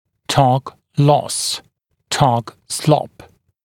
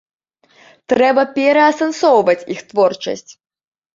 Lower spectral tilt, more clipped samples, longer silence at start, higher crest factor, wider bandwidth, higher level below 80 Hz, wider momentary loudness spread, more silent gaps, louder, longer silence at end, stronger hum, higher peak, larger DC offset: about the same, -5 dB/octave vs -4 dB/octave; neither; second, 0.3 s vs 0.9 s; about the same, 18 dB vs 14 dB; first, 16.5 kHz vs 7.6 kHz; first, -50 dBFS vs -62 dBFS; about the same, 11 LU vs 11 LU; neither; second, -18 LUFS vs -15 LUFS; second, 0.6 s vs 0.75 s; neither; about the same, 0 dBFS vs -2 dBFS; neither